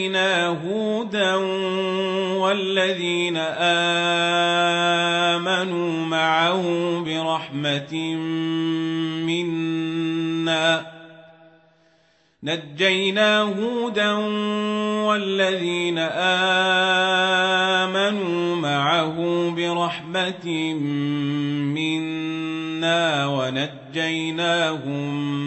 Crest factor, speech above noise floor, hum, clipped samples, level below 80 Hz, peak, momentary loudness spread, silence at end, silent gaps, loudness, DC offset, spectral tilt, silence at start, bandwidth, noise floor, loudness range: 16 dB; 39 dB; none; under 0.1%; -70 dBFS; -6 dBFS; 7 LU; 0 s; none; -21 LUFS; under 0.1%; -4.5 dB/octave; 0 s; 8.4 kHz; -61 dBFS; 5 LU